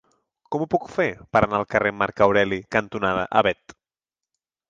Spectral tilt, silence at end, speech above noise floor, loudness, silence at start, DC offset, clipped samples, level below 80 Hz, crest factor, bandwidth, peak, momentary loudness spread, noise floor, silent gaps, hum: -6 dB/octave; 1.15 s; over 68 dB; -22 LUFS; 0.5 s; under 0.1%; under 0.1%; -50 dBFS; 20 dB; 7.6 kHz; -2 dBFS; 6 LU; under -90 dBFS; none; none